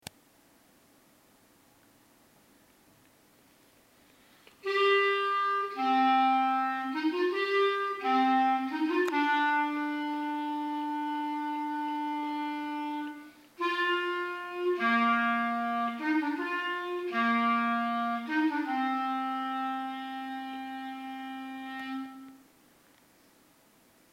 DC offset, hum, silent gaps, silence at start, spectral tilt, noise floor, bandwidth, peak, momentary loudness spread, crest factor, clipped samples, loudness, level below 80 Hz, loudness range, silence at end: under 0.1%; none; none; 4.65 s; -4 dB/octave; -63 dBFS; 16 kHz; -16 dBFS; 13 LU; 16 dB; under 0.1%; -30 LUFS; -80 dBFS; 10 LU; 1.75 s